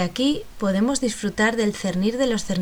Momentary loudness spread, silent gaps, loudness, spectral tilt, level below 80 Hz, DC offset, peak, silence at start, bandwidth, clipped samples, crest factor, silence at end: 4 LU; none; -22 LUFS; -4.5 dB/octave; -46 dBFS; under 0.1%; -8 dBFS; 0 s; over 20 kHz; under 0.1%; 14 dB; 0 s